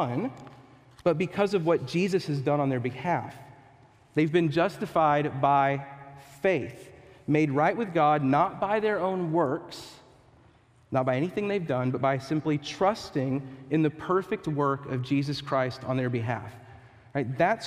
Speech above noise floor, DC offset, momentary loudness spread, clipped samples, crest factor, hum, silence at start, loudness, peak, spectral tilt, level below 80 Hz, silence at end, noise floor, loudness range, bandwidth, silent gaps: 32 dB; under 0.1%; 11 LU; under 0.1%; 18 dB; none; 0 s; -27 LUFS; -10 dBFS; -7 dB/octave; -64 dBFS; 0 s; -59 dBFS; 3 LU; 14 kHz; none